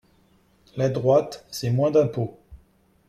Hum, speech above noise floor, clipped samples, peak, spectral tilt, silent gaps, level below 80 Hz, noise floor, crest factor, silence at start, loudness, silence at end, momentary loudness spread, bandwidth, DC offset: none; 38 dB; under 0.1%; -8 dBFS; -7 dB/octave; none; -56 dBFS; -60 dBFS; 18 dB; 0.75 s; -23 LUFS; 0.55 s; 13 LU; 15 kHz; under 0.1%